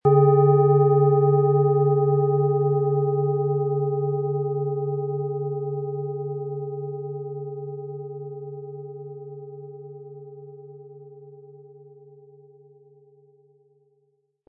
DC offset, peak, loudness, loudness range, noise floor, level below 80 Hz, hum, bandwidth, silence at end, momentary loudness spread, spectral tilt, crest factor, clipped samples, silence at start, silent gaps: under 0.1%; -6 dBFS; -22 LUFS; 23 LU; -69 dBFS; -70 dBFS; none; 2.4 kHz; 2.6 s; 23 LU; -15.5 dB/octave; 18 dB; under 0.1%; 0.05 s; none